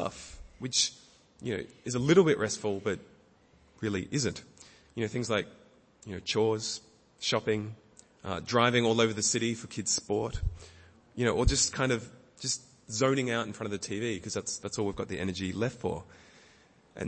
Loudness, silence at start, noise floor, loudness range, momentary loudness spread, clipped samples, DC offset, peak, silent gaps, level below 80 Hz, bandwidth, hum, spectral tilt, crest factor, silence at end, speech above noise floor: -30 LUFS; 0 s; -62 dBFS; 6 LU; 16 LU; under 0.1%; under 0.1%; -10 dBFS; none; -46 dBFS; 8.8 kHz; none; -4 dB/octave; 22 dB; 0 s; 32 dB